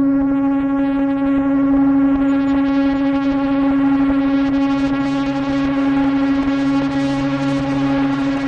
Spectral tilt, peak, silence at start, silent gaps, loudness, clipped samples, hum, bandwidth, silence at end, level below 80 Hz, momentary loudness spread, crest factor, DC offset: -7.5 dB/octave; -8 dBFS; 0 s; none; -17 LUFS; under 0.1%; none; 7 kHz; 0 s; -40 dBFS; 4 LU; 8 dB; under 0.1%